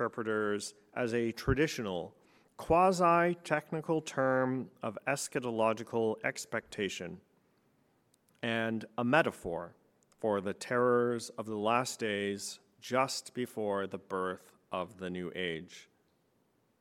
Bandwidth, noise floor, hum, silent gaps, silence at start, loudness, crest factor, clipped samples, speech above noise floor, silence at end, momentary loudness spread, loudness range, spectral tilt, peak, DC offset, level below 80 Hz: 16.5 kHz; -73 dBFS; none; none; 0 s; -33 LUFS; 24 dB; under 0.1%; 40 dB; 1 s; 13 LU; 6 LU; -5 dB/octave; -10 dBFS; under 0.1%; -58 dBFS